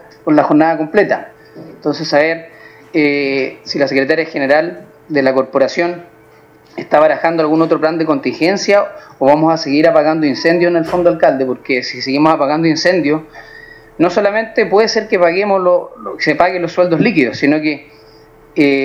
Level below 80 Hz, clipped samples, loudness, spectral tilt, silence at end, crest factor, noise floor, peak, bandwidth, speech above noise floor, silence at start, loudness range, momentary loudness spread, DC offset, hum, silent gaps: -54 dBFS; under 0.1%; -13 LUFS; -5.5 dB/octave; 0 s; 14 dB; -44 dBFS; 0 dBFS; 7.8 kHz; 31 dB; 0.25 s; 3 LU; 8 LU; under 0.1%; none; none